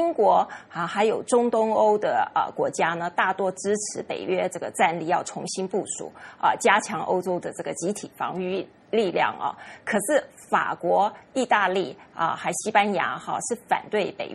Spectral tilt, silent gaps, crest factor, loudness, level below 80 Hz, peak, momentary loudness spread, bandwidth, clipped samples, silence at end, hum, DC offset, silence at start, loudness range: -3.5 dB/octave; none; 20 dB; -25 LUFS; -70 dBFS; -4 dBFS; 10 LU; 13 kHz; under 0.1%; 0 s; none; under 0.1%; 0 s; 3 LU